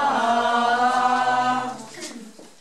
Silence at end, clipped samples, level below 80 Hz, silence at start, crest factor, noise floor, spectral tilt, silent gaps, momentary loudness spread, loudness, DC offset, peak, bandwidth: 0.15 s; under 0.1%; -74 dBFS; 0 s; 14 dB; -41 dBFS; -3 dB/octave; none; 16 LU; -20 LUFS; 0.3%; -6 dBFS; 12.5 kHz